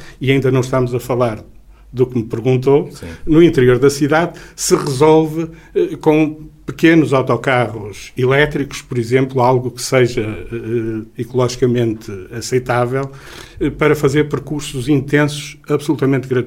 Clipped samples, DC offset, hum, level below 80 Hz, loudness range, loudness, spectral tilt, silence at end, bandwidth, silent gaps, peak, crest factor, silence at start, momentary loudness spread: under 0.1%; under 0.1%; none; -40 dBFS; 4 LU; -15 LUFS; -6 dB/octave; 0 s; 16.5 kHz; none; 0 dBFS; 16 dB; 0 s; 14 LU